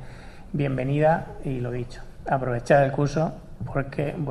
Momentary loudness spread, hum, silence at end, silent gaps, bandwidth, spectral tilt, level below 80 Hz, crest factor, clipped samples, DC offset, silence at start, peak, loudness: 18 LU; none; 0 s; none; 11 kHz; -8 dB/octave; -42 dBFS; 18 dB; under 0.1%; under 0.1%; 0 s; -6 dBFS; -25 LUFS